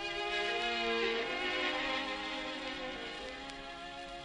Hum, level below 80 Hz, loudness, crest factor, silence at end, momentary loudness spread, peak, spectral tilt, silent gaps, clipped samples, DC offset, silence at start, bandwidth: none; -60 dBFS; -36 LUFS; 16 dB; 0 s; 12 LU; -22 dBFS; -2.5 dB/octave; none; under 0.1%; under 0.1%; 0 s; 11 kHz